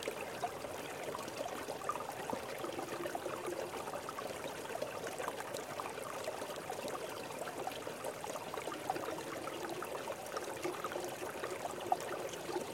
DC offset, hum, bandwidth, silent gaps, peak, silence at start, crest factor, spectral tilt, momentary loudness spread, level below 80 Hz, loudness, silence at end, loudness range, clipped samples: under 0.1%; none; 17 kHz; none; -18 dBFS; 0 s; 24 dB; -3 dB/octave; 3 LU; -74 dBFS; -42 LUFS; 0 s; 1 LU; under 0.1%